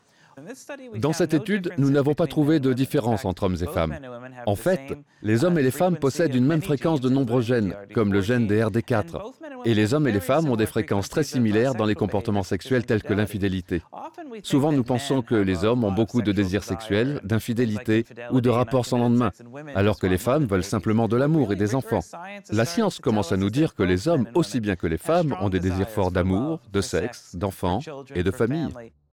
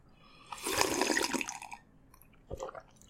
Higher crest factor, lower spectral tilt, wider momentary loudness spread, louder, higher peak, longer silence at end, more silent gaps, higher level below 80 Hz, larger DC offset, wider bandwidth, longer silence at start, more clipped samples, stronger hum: second, 12 dB vs 30 dB; first, -6.5 dB/octave vs -2 dB/octave; second, 9 LU vs 19 LU; first, -23 LUFS vs -33 LUFS; about the same, -10 dBFS vs -8 dBFS; about the same, 0.3 s vs 0.3 s; neither; first, -50 dBFS vs -60 dBFS; neither; first, 18.5 kHz vs 16.5 kHz; first, 0.35 s vs 0.2 s; neither; neither